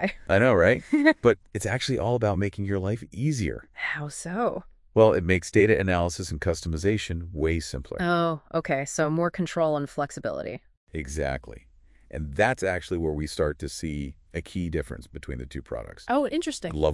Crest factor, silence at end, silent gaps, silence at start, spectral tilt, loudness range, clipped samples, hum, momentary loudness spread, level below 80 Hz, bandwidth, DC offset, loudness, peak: 20 dB; 0 s; 10.77-10.87 s; 0 s; -5.5 dB/octave; 7 LU; under 0.1%; none; 15 LU; -44 dBFS; 12 kHz; under 0.1%; -26 LUFS; -6 dBFS